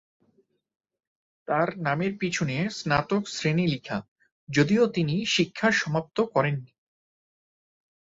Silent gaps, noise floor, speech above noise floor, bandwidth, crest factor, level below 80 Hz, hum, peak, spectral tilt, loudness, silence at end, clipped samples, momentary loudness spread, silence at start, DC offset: 4.08-4.16 s, 4.32-4.47 s; -68 dBFS; 43 dB; 8 kHz; 20 dB; -60 dBFS; none; -8 dBFS; -5.5 dB/octave; -26 LUFS; 1.45 s; under 0.1%; 6 LU; 1.5 s; under 0.1%